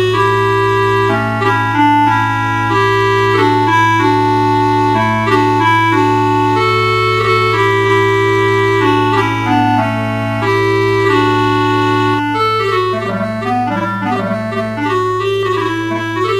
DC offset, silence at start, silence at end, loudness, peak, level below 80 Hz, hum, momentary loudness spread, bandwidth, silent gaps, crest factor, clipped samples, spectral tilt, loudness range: 0.3%; 0 s; 0 s; -13 LUFS; 0 dBFS; -40 dBFS; none; 6 LU; 15 kHz; none; 12 dB; under 0.1%; -6 dB/octave; 4 LU